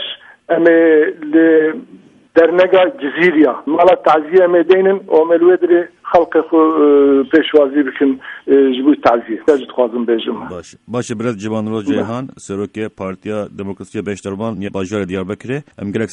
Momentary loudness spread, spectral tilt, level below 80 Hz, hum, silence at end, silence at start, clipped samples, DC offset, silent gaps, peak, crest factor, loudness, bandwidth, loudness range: 14 LU; -6.5 dB/octave; -56 dBFS; none; 0 s; 0 s; under 0.1%; under 0.1%; none; 0 dBFS; 14 dB; -14 LUFS; 9.6 kHz; 11 LU